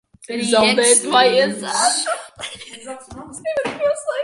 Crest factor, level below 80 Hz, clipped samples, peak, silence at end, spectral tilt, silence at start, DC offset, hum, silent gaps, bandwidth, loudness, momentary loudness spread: 18 dB; -56 dBFS; under 0.1%; -2 dBFS; 0 s; -1.5 dB/octave; 0.3 s; under 0.1%; none; none; 11.5 kHz; -16 LUFS; 21 LU